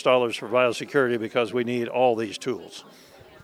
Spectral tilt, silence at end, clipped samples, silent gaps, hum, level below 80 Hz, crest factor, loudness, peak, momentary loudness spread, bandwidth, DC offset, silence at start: -5 dB/octave; 0.6 s; under 0.1%; none; none; -72 dBFS; 18 dB; -24 LUFS; -6 dBFS; 10 LU; 14.5 kHz; under 0.1%; 0 s